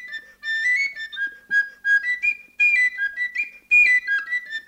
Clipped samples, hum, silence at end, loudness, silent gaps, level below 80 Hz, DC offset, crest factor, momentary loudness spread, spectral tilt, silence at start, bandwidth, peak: under 0.1%; none; 0.05 s; -19 LUFS; none; -66 dBFS; under 0.1%; 14 dB; 13 LU; 1.5 dB/octave; 0 s; 16 kHz; -8 dBFS